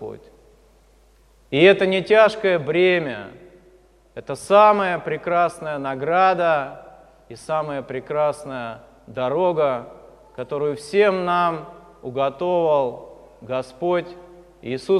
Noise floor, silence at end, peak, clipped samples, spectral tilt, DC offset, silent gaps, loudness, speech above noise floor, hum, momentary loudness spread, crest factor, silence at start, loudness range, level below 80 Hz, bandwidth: -54 dBFS; 0 s; -2 dBFS; under 0.1%; -5.5 dB/octave; under 0.1%; none; -20 LUFS; 34 dB; none; 22 LU; 20 dB; 0 s; 6 LU; -58 dBFS; 12 kHz